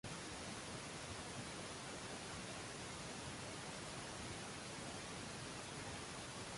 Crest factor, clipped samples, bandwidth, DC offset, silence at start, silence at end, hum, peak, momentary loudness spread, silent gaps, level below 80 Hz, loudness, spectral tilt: 14 dB; under 0.1%; 11.5 kHz; under 0.1%; 0.05 s; 0 s; none; -36 dBFS; 0 LU; none; -66 dBFS; -48 LUFS; -3 dB/octave